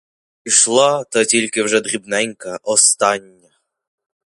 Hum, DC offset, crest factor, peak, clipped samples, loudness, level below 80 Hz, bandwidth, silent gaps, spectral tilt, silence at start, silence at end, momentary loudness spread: none; under 0.1%; 18 dB; 0 dBFS; under 0.1%; -15 LUFS; -66 dBFS; 11.5 kHz; none; -1 dB/octave; 0.45 s; 1.1 s; 11 LU